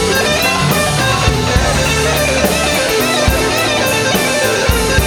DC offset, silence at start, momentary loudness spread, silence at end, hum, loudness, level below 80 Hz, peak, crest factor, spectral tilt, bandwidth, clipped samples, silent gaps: under 0.1%; 0 s; 1 LU; 0 s; none; -12 LUFS; -24 dBFS; 0 dBFS; 12 dB; -3.5 dB/octave; over 20 kHz; under 0.1%; none